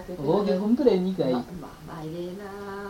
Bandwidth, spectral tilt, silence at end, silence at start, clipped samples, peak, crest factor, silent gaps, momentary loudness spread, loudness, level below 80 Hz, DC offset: 17 kHz; -8 dB/octave; 0 s; 0 s; under 0.1%; -8 dBFS; 20 dB; none; 17 LU; -25 LUFS; -54 dBFS; under 0.1%